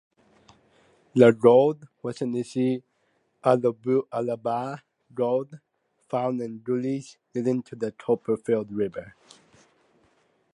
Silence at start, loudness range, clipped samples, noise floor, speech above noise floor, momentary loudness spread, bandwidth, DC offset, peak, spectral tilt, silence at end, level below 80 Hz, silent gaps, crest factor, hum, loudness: 1.15 s; 7 LU; under 0.1%; -70 dBFS; 46 dB; 16 LU; 11 kHz; under 0.1%; -4 dBFS; -7.5 dB/octave; 1.45 s; -70 dBFS; none; 22 dB; none; -25 LUFS